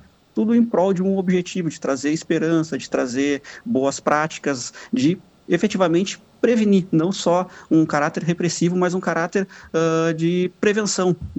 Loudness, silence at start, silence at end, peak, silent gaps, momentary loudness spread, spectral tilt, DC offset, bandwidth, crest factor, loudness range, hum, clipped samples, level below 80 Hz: -21 LUFS; 0.35 s; 0 s; -4 dBFS; none; 7 LU; -5.5 dB/octave; under 0.1%; 8.4 kHz; 16 dB; 2 LU; none; under 0.1%; -54 dBFS